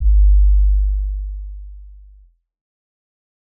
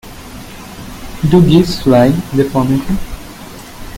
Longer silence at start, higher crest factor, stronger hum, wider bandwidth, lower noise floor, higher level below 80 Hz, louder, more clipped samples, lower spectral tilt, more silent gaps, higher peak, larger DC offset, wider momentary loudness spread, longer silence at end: about the same, 0 s vs 0.05 s; about the same, 10 dB vs 14 dB; neither; second, 0.2 kHz vs 17 kHz; first, -49 dBFS vs -31 dBFS; first, -16 dBFS vs -30 dBFS; second, -18 LUFS vs -12 LUFS; neither; first, -26 dB/octave vs -7 dB/octave; neither; second, -6 dBFS vs 0 dBFS; neither; about the same, 22 LU vs 22 LU; first, 1.55 s vs 0 s